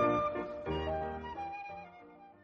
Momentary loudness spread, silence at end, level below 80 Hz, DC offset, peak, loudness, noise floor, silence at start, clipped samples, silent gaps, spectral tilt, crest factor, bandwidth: 20 LU; 0.1 s; -52 dBFS; under 0.1%; -20 dBFS; -37 LUFS; -56 dBFS; 0 s; under 0.1%; none; -7.5 dB/octave; 18 dB; 6.6 kHz